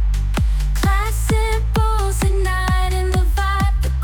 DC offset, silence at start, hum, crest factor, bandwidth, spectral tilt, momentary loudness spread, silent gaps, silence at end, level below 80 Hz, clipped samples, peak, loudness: under 0.1%; 0 s; none; 10 dB; 18 kHz; -5.5 dB/octave; 2 LU; none; 0 s; -18 dBFS; under 0.1%; -6 dBFS; -19 LUFS